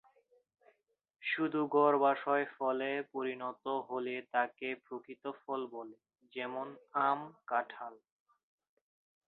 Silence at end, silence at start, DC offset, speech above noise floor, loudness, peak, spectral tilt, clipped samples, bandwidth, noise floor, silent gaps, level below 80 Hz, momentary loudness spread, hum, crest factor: 1.3 s; 1.2 s; under 0.1%; 36 dB; -35 LUFS; -16 dBFS; -3 dB/octave; under 0.1%; 4.4 kHz; -71 dBFS; none; -90 dBFS; 15 LU; none; 22 dB